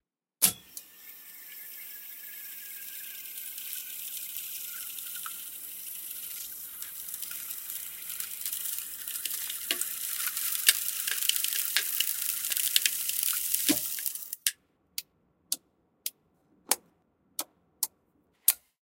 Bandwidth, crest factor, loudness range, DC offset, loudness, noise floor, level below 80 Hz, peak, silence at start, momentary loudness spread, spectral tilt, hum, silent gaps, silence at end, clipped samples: 17.5 kHz; 32 dB; 10 LU; under 0.1%; -30 LUFS; -70 dBFS; -74 dBFS; -2 dBFS; 0.4 s; 15 LU; 1 dB/octave; none; none; 0.25 s; under 0.1%